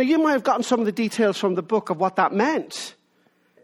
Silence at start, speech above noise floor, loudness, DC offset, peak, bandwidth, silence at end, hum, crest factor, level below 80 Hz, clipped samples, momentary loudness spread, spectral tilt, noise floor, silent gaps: 0 s; 42 dB; -22 LUFS; under 0.1%; -4 dBFS; 16 kHz; 0.75 s; none; 18 dB; -70 dBFS; under 0.1%; 9 LU; -5 dB/octave; -63 dBFS; none